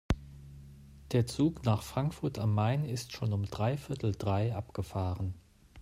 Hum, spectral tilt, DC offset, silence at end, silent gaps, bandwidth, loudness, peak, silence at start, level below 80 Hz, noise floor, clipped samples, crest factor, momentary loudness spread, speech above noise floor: none; -7 dB/octave; under 0.1%; 0 s; none; 14.5 kHz; -33 LUFS; -14 dBFS; 0.1 s; -50 dBFS; -52 dBFS; under 0.1%; 18 dB; 18 LU; 20 dB